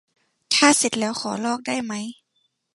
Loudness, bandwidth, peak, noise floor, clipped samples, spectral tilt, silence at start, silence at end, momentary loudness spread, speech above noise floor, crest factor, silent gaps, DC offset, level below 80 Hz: -21 LUFS; 12 kHz; -2 dBFS; -71 dBFS; under 0.1%; -2 dB/octave; 0.5 s; 0.65 s; 15 LU; 48 dB; 22 dB; none; under 0.1%; -70 dBFS